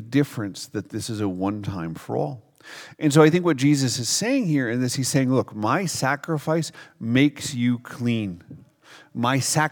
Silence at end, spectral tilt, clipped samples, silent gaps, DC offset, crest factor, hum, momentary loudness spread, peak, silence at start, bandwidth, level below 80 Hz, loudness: 0 s; -5 dB/octave; under 0.1%; none; under 0.1%; 22 dB; none; 12 LU; 0 dBFS; 0 s; 19.5 kHz; -64 dBFS; -23 LUFS